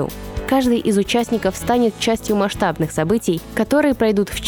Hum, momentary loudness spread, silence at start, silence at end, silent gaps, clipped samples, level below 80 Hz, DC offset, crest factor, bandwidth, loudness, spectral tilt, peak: none; 5 LU; 0 s; 0 s; none; under 0.1%; -38 dBFS; under 0.1%; 14 dB; over 20 kHz; -18 LUFS; -5 dB/octave; -4 dBFS